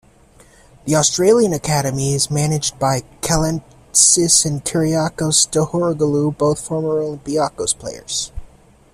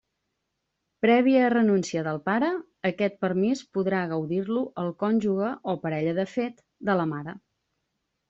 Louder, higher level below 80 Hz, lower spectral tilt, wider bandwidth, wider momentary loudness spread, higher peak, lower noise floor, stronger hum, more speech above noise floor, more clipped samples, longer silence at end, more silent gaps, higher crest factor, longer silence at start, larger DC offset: first, -16 LUFS vs -26 LUFS; first, -42 dBFS vs -68 dBFS; second, -4 dB/octave vs -5.5 dB/octave; first, 15 kHz vs 7.8 kHz; about the same, 10 LU vs 10 LU; first, 0 dBFS vs -10 dBFS; second, -48 dBFS vs -80 dBFS; neither; second, 31 dB vs 55 dB; neither; second, 0.5 s vs 0.9 s; neither; about the same, 18 dB vs 16 dB; second, 0.85 s vs 1.05 s; neither